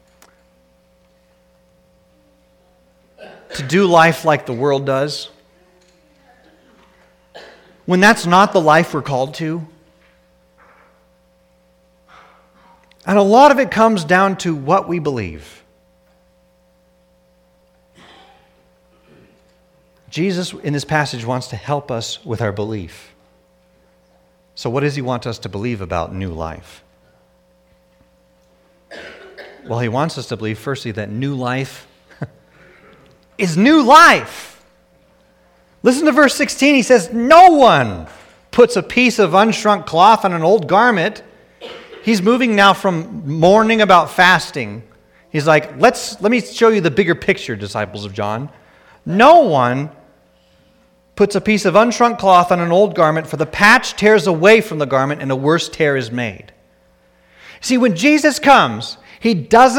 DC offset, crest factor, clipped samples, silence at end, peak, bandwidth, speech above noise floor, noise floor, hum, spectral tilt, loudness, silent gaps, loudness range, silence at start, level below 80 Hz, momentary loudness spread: under 0.1%; 16 dB; under 0.1%; 0 s; 0 dBFS; 18.5 kHz; 42 dB; -55 dBFS; none; -5 dB/octave; -14 LUFS; none; 14 LU; 3.2 s; -50 dBFS; 17 LU